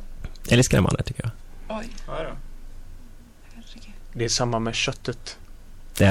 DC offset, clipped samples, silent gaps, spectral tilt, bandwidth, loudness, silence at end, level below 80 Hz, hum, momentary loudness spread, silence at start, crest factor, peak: under 0.1%; under 0.1%; none; -4.5 dB/octave; 17 kHz; -24 LUFS; 0 s; -36 dBFS; none; 25 LU; 0 s; 18 dB; -8 dBFS